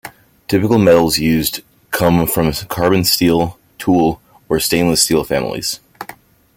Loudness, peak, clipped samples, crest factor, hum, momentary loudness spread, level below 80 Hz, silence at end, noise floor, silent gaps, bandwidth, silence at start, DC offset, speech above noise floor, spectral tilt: -15 LUFS; 0 dBFS; under 0.1%; 16 dB; none; 16 LU; -40 dBFS; 0.45 s; -40 dBFS; none; 17 kHz; 0.05 s; under 0.1%; 26 dB; -4.5 dB/octave